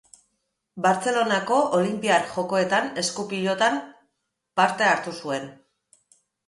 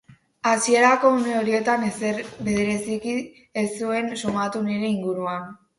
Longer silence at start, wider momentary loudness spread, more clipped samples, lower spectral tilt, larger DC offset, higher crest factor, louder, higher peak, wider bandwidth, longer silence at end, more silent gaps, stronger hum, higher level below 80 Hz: first, 0.75 s vs 0.1 s; second, 9 LU vs 12 LU; neither; about the same, -3.5 dB/octave vs -4.5 dB/octave; neither; about the same, 18 dB vs 20 dB; about the same, -23 LUFS vs -23 LUFS; about the same, -6 dBFS vs -4 dBFS; about the same, 11.5 kHz vs 11.5 kHz; first, 0.95 s vs 0.25 s; neither; neither; second, -70 dBFS vs -58 dBFS